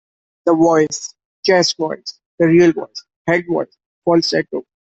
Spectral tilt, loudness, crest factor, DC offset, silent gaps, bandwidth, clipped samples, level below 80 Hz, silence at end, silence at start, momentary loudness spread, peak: -4.5 dB/octave; -16 LUFS; 14 dB; under 0.1%; 1.25-1.43 s, 2.26-2.38 s, 3.16-3.25 s, 3.86-4.02 s; 8 kHz; under 0.1%; -58 dBFS; 0.25 s; 0.45 s; 15 LU; -2 dBFS